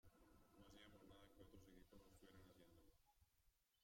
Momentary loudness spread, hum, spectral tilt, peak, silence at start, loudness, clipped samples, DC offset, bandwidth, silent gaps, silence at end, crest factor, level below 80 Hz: 2 LU; none; -5 dB/octave; -52 dBFS; 0.05 s; -69 LUFS; under 0.1%; under 0.1%; 16 kHz; none; 0 s; 18 dB; -78 dBFS